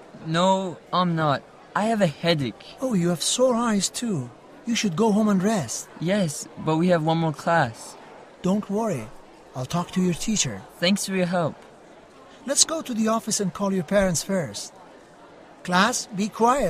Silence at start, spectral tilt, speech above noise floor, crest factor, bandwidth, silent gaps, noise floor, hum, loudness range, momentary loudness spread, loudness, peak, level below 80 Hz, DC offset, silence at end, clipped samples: 0 s; -4.5 dB/octave; 25 dB; 22 dB; 15.5 kHz; none; -48 dBFS; none; 3 LU; 11 LU; -24 LUFS; -2 dBFS; -52 dBFS; under 0.1%; 0 s; under 0.1%